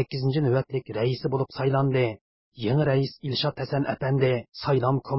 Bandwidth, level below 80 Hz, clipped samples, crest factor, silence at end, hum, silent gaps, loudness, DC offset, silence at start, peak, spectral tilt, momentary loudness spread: 5.8 kHz; -58 dBFS; under 0.1%; 16 dB; 0 s; none; 2.21-2.52 s; -26 LUFS; under 0.1%; 0 s; -10 dBFS; -11 dB/octave; 5 LU